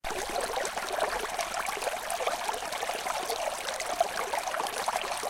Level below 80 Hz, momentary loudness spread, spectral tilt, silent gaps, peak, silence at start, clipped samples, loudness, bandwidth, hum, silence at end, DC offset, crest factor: -56 dBFS; 3 LU; -0.5 dB/octave; none; -12 dBFS; 0.05 s; under 0.1%; -31 LUFS; 17 kHz; none; 0 s; under 0.1%; 20 dB